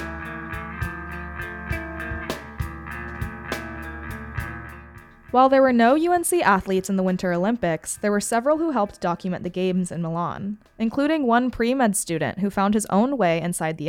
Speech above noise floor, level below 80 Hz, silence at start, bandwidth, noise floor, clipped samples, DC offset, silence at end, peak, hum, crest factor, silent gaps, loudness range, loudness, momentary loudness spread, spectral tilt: 23 dB; -44 dBFS; 0 s; 17.5 kHz; -45 dBFS; under 0.1%; under 0.1%; 0 s; -6 dBFS; none; 18 dB; none; 11 LU; -23 LUFS; 15 LU; -5 dB/octave